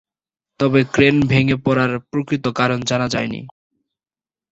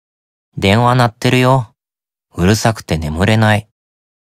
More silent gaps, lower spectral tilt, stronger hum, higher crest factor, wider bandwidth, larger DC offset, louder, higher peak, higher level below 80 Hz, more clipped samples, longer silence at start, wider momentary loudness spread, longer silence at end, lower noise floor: neither; about the same, -6 dB/octave vs -5.5 dB/octave; neither; about the same, 18 dB vs 14 dB; second, 8.2 kHz vs 15.5 kHz; neither; second, -18 LUFS vs -14 LUFS; about the same, 0 dBFS vs 0 dBFS; second, -48 dBFS vs -36 dBFS; neither; about the same, 0.6 s vs 0.55 s; about the same, 9 LU vs 8 LU; first, 1 s vs 0.7 s; about the same, under -90 dBFS vs under -90 dBFS